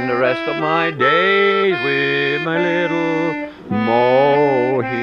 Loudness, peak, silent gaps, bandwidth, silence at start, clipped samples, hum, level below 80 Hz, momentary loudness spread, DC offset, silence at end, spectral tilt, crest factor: -16 LUFS; -2 dBFS; none; 7.2 kHz; 0 s; under 0.1%; none; -56 dBFS; 7 LU; under 0.1%; 0 s; -6.5 dB/octave; 14 dB